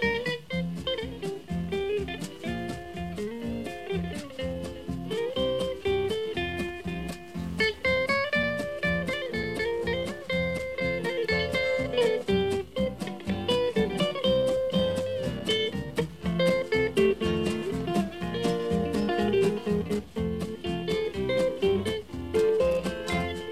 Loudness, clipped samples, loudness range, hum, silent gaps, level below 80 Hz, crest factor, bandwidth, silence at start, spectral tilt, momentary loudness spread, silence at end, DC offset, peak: -29 LUFS; under 0.1%; 6 LU; none; none; -46 dBFS; 16 dB; 14.5 kHz; 0 s; -5.5 dB/octave; 10 LU; 0 s; 0.3%; -12 dBFS